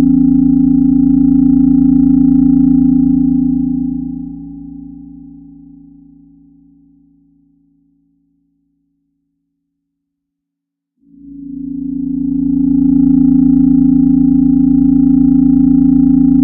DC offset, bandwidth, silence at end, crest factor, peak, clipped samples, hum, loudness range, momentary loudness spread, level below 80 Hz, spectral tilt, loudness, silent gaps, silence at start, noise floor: under 0.1%; 1.4 kHz; 0 s; 12 dB; 0 dBFS; under 0.1%; none; 17 LU; 16 LU; -32 dBFS; -15 dB/octave; -10 LUFS; none; 0 s; -78 dBFS